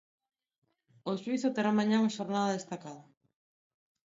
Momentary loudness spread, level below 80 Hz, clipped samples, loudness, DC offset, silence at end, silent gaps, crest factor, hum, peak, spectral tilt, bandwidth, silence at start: 15 LU; -80 dBFS; under 0.1%; -31 LUFS; under 0.1%; 1.05 s; none; 18 dB; none; -16 dBFS; -5.5 dB/octave; 7.8 kHz; 1.05 s